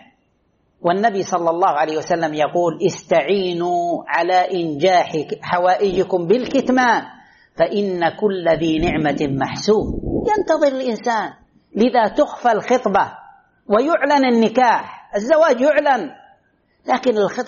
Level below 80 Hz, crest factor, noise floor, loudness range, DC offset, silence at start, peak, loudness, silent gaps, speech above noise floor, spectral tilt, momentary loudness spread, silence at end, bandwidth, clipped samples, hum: -44 dBFS; 14 dB; -63 dBFS; 2 LU; under 0.1%; 0.85 s; -4 dBFS; -18 LUFS; none; 46 dB; -4 dB/octave; 7 LU; 0 s; 7.2 kHz; under 0.1%; none